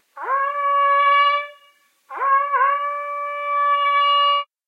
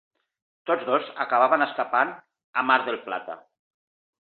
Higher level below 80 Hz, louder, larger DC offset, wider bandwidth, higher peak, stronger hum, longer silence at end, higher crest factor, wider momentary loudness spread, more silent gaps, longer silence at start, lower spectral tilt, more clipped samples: second, under -90 dBFS vs -80 dBFS; first, -18 LUFS vs -24 LUFS; neither; about the same, 4.9 kHz vs 4.5 kHz; about the same, -6 dBFS vs -6 dBFS; neither; second, 0.25 s vs 0.85 s; second, 14 dB vs 20 dB; second, 10 LU vs 13 LU; second, none vs 2.44-2.53 s; second, 0.15 s vs 0.65 s; second, 2.5 dB/octave vs -7.5 dB/octave; neither